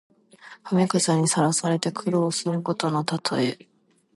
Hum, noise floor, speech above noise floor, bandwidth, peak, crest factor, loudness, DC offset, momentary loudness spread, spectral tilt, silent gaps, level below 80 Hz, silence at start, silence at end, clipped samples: none; -49 dBFS; 26 dB; 11.5 kHz; -6 dBFS; 18 dB; -23 LUFS; under 0.1%; 6 LU; -4.5 dB/octave; none; -70 dBFS; 0.45 s; 0.6 s; under 0.1%